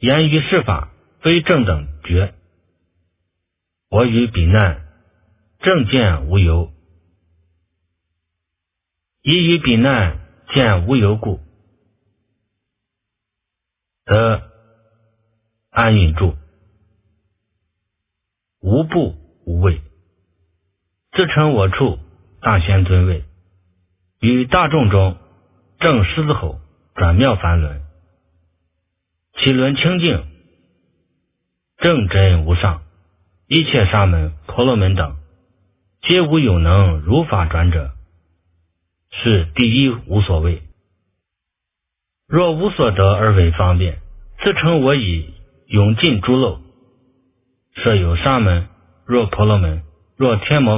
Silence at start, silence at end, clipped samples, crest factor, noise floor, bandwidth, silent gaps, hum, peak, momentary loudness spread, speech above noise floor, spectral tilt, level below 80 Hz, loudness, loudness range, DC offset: 0 s; 0 s; under 0.1%; 18 dB; -81 dBFS; 3.8 kHz; none; none; 0 dBFS; 11 LU; 67 dB; -11 dB/octave; -26 dBFS; -16 LUFS; 6 LU; under 0.1%